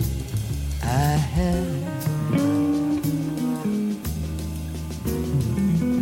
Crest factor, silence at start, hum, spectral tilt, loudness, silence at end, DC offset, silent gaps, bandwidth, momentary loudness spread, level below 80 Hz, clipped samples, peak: 14 dB; 0 s; none; -7 dB/octave; -24 LUFS; 0 s; under 0.1%; none; 17 kHz; 8 LU; -34 dBFS; under 0.1%; -10 dBFS